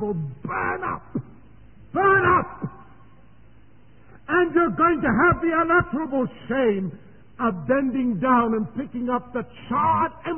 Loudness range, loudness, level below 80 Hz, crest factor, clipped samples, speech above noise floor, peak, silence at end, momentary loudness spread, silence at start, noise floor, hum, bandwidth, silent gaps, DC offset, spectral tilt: 3 LU; -22 LUFS; -48 dBFS; 16 dB; under 0.1%; 31 dB; -6 dBFS; 0 s; 13 LU; 0 s; -53 dBFS; none; 3.3 kHz; none; 0.4%; -11.5 dB/octave